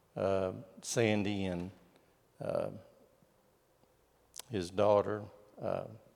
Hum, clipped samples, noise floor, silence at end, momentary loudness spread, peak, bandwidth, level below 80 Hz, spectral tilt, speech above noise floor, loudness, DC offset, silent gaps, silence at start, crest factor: none; under 0.1%; -70 dBFS; 0.2 s; 18 LU; -16 dBFS; 17 kHz; -76 dBFS; -5.5 dB/octave; 36 dB; -35 LUFS; under 0.1%; none; 0.15 s; 22 dB